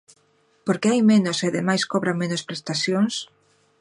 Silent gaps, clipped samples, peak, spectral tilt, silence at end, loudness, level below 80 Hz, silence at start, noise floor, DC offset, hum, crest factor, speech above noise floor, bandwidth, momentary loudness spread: none; under 0.1%; -6 dBFS; -5 dB/octave; 0.55 s; -22 LUFS; -70 dBFS; 0.65 s; -63 dBFS; under 0.1%; none; 16 dB; 41 dB; 11 kHz; 11 LU